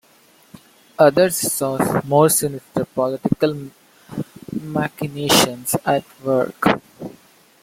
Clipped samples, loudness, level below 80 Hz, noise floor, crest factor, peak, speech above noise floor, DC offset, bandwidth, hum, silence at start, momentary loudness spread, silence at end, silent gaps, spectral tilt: under 0.1%; -19 LUFS; -54 dBFS; -53 dBFS; 20 dB; 0 dBFS; 35 dB; under 0.1%; 16.5 kHz; none; 1 s; 18 LU; 0.55 s; none; -4 dB/octave